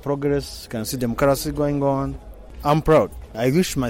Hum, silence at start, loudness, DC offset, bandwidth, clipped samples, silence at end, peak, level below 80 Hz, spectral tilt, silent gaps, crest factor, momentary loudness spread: none; 0 s; -21 LUFS; under 0.1%; 16.5 kHz; under 0.1%; 0 s; -6 dBFS; -38 dBFS; -6 dB/octave; none; 14 dB; 11 LU